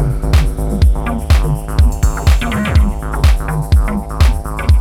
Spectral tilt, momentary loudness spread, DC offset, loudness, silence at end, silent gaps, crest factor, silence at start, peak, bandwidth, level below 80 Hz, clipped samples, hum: -6 dB/octave; 4 LU; under 0.1%; -15 LUFS; 0 s; none; 12 dB; 0 s; 0 dBFS; 15.5 kHz; -14 dBFS; under 0.1%; none